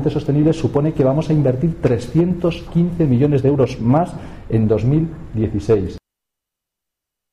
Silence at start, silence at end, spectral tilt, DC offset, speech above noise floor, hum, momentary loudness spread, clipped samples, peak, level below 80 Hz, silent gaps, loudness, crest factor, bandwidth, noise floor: 0 s; 1.35 s; -9 dB/octave; under 0.1%; 66 dB; none; 6 LU; under 0.1%; -4 dBFS; -38 dBFS; none; -17 LUFS; 12 dB; 10.5 kHz; -83 dBFS